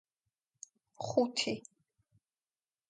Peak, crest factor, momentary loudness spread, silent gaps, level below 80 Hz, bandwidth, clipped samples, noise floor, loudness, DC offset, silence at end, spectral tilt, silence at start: -16 dBFS; 24 dB; 23 LU; none; -80 dBFS; 9.6 kHz; under 0.1%; under -90 dBFS; -35 LUFS; under 0.1%; 1.3 s; -3.5 dB/octave; 1 s